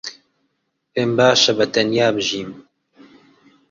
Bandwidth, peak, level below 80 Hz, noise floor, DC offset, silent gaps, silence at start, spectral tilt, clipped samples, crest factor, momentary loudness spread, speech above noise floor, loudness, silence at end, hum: 7.8 kHz; -2 dBFS; -60 dBFS; -71 dBFS; under 0.1%; none; 0.05 s; -3.5 dB/octave; under 0.1%; 18 dB; 15 LU; 54 dB; -17 LUFS; 1.1 s; none